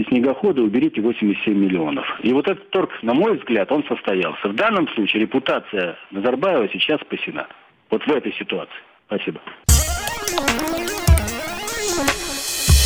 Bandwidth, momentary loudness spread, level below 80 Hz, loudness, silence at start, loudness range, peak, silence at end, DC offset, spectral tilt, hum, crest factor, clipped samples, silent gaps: 19.5 kHz; 8 LU; -28 dBFS; -20 LUFS; 0 s; 3 LU; -2 dBFS; 0 s; under 0.1%; -4.5 dB/octave; none; 18 dB; under 0.1%; none